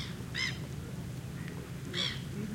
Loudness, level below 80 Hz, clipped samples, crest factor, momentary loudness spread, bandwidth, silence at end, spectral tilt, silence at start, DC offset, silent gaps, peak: -37 LUFS; -54 dBFS; under 0.1%; 18 dB; 8 LU; 16.5 kHz; 0 s; -4 dB/octave; 0 s; under 0.1%; none; -20 dBFS